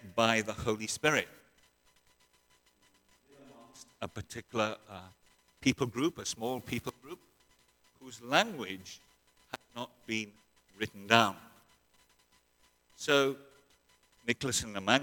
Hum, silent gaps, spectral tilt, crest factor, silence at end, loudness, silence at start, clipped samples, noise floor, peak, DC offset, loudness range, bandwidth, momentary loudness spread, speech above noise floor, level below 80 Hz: none; none; -3.5 dB/octave; 30 dB; 0 s; -32 LUFS; 0.05 s; under 0.1%; -70 dBFS; -4 dBFS; under 0.1%; 9 LU; 19 kHz; 22 LU; 37 dB; -64 dBFS